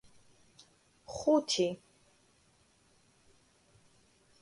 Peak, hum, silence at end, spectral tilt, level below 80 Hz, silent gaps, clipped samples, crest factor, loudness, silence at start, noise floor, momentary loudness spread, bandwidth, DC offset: -16 dBFS; none; 2.65 s; -4 dB/octave; -70 dBFS; none; under 0.1%; 22 dB; -31 LUFS; 1.1 s; -68 dBFS; 18 LU; 11.5 kHz; under 0.1%